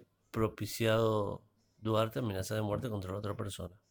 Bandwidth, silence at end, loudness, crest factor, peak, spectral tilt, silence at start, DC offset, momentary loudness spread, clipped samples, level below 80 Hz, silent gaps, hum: over 20 kHz; 0.15 s; -35 LUFS; 18 dB; -16 dBFS; -6 dB/octave; 0 s; under 0.1%; 12 LU; under 0.1%; -60 dBFS; none; none